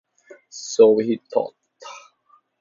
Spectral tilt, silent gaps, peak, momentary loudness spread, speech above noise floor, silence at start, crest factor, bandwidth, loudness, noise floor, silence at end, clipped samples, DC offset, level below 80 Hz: -4.5 dB/octave; none; -2 dBFS; 25 LU; 42 dB; 0.55 s; 20 dB; 7.6 kHz; -19 LUFS; -60 dBFS; 0.65 s; under 0.1%; under 0.1%; -72 dBFS